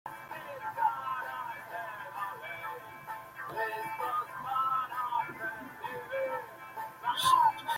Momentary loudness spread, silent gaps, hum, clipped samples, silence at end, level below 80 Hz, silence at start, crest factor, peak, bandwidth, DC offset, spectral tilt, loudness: 14 LU; none; none; under 0.1%; 0 s; -74 dBFS; 0.05 s; 22 dB; -14 dBFS; 16.5 kHz; under 0.1%; -2 dB/octave; -34 LUFS